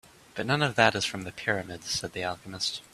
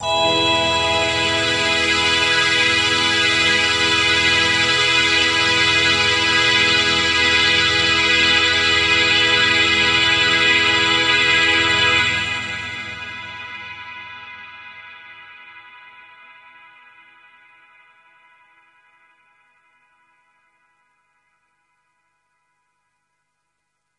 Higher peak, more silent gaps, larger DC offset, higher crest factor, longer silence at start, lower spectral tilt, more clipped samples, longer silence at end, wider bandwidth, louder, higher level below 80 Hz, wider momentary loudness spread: about the same, -2 dBFS vs -2 dBFS; neither; neither; first, 26 dB vs 18 dB; first, 0.35 s vs 0 s; first, -3.5 dB/octave vs -1.5 dB/octave; neither; second, 0.1 s vs 8.4 s; first, 14.5 kHz vs 11.5 kHz; second, -28 LUFS vs -14 LUFS; second, -60 dBFS vs -50 dBFS; second, 11 LU vs 17 LU